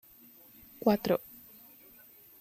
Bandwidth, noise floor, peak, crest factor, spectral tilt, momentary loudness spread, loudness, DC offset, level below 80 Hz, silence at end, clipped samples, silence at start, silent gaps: 16 kHz; -57 dBFS; -12 dBFS; 24 dB; -6.5 dB/octave; 24 LU; -30 LUFS; under 0.1%; -68 dBFS; 1.25 s; under 0.1%; 0.85 s; none